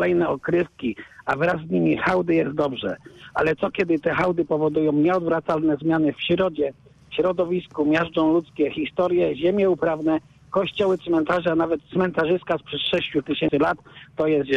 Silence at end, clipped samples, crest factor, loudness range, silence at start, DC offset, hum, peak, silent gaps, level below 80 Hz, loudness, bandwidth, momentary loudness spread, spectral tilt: 0 s; under 0.1%; 12 dB; 1 LU; 0 s; under 0.1%; none; -10 dBFS; none; -54 dBFS; -22 LUFS; 7.6 kHz; 7 LU; -7.5 dB/octave